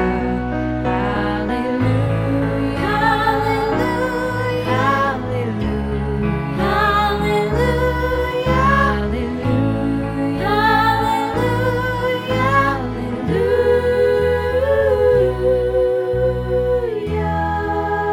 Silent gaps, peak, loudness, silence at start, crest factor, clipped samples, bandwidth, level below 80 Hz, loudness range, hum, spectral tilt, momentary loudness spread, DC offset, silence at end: none; -4 dBFS; -18 LUFS; 0 s; 14 dB; under 0.1%; 16.5 kHz; -30 dBFS; 2 LU; none; -7 dB/octave; 6 LU; under 0.1%; 0 s